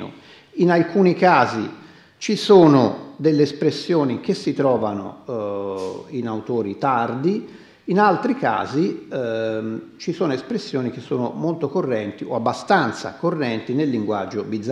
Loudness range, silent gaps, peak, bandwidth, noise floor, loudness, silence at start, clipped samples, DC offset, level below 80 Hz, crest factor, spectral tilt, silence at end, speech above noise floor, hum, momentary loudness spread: 7 LU; none; -2 dBFS; 11.5 kHz; -43 dBFS; -21 LUFS; 0 s; under 0.1%; under 0.1%; -68 dBFS; 20 dB; -6.5 dB/octave; 0 s; 23 dB; none; 13 LU